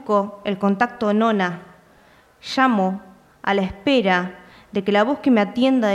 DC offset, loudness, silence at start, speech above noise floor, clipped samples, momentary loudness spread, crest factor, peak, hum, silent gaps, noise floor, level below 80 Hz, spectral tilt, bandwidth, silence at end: under 0.1%; -20 LUFS; 0 s; 34 dB; under 0.1%; 11 LU; 16 dB; -4 dBFS; none; none; -53 dBFS; -54 dBFS; -6.5 dB/octave; 11 kHz; 0 s